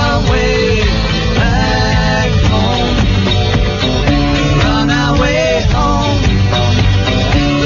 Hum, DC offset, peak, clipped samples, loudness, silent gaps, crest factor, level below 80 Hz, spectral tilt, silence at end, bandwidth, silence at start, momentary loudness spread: none; under 0.1%; 0 dBFS; under 0.1%; -12 LUFS; none; 12 dB; -18 dBFS; -5.5 dB/octave; 0 s; 7.2 kHz; 0 s; 1 LU